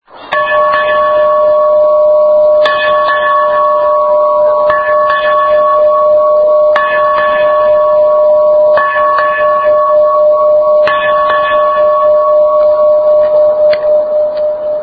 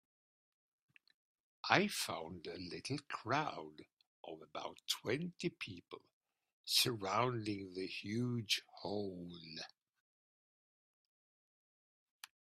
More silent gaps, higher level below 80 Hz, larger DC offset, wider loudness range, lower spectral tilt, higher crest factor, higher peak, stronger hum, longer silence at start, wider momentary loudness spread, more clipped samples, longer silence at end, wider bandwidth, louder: second, none vs 3.93-3.97 s, 4.07-4.24 s, 6.13-6.21 s, 6.53-6.64 s; first, -46 dBFS vs -82 dBFS; neither; second, 1 LU vs 7 LU; first, -5.5 dB/octave vs -3.5 dB/octave; second, 8 dB vs 32 dB; first, 0 dBFS vs -12 dBFS; neither; second, 0.15 s vs 1.65 s; second, 2 LU vs 20 LU; neither; second, 0 s vs 2.8 s; second, 4.9 kHz vs 13.5 kHz; first, -8 LUFS vs -39 LUFS